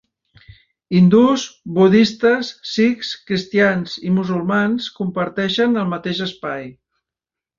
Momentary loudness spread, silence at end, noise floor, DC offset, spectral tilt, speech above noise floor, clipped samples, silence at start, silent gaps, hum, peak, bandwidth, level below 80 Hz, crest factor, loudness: 11 LU; 0.85 s; -87 dBFS; under 0.1%; -6 dB/octave; 70 dB; under 0.1%; 0.9 s; none; none; -2 dBFS; 7.4 kHz; -56 dBFS; 16 dB; -17 LUFS